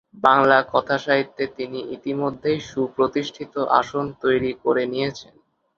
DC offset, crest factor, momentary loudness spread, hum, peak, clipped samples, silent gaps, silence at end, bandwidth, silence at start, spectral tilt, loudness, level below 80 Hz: under 0.1%; 22 dB; 12 LU; none; 0 dBFS; under 0.1%; none; 0.55 s; 7.4 kHz; 0.15 s; -5.5 dB/octave; -22 LUFS; -58 dBFS